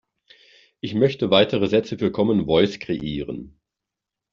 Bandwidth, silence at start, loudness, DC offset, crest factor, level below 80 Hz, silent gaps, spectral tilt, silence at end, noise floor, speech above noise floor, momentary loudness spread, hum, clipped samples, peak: 7.4 kHz; 0.85 s; -21 LUFS; under 0.1%; 20 dB; -52 dBFS; none; -4.5 dB/octave; 0.85 s; -86 dBFS; 65 dB; 13 LU; none; under 0.1%; -2 dBFS